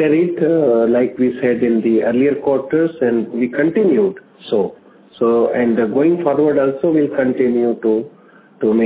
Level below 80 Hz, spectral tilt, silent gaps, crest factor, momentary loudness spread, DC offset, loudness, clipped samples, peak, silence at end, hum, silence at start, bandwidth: -56 dBFS; -11.5 dB/octave; none; 14 dB; 6 LU; under 0.1%; -16 LUFS; under 0.1%; -2 dBFS; 0 s; none; 0 s; 4 kHz